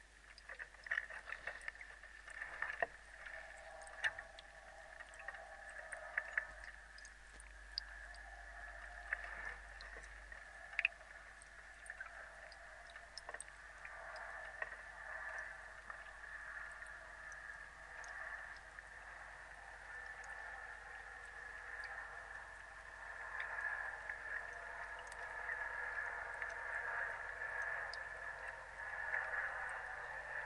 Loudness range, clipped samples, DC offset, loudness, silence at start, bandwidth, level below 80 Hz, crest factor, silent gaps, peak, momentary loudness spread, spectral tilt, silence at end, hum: 7 LU; under 0.1%; under 0.1%; -47 LUFS; 0 s; 11.5 kHz; -64 dBFS; 30 dB; none; -18 dBFS; 12 LU; -1.5 dB/octave; 0 s; none